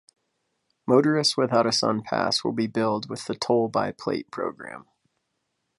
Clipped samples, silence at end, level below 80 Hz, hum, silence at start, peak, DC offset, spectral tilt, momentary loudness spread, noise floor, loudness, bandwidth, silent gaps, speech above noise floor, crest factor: under 0.1%; 1 s; -66 dBFS; none; 0.85 s; -6 dBFS; under 0.1%; -4.5 dB/octave; 11 LU; -77 dBFS; -24 LUFS; 11.5 kHz; none; 53 dB; 20 dB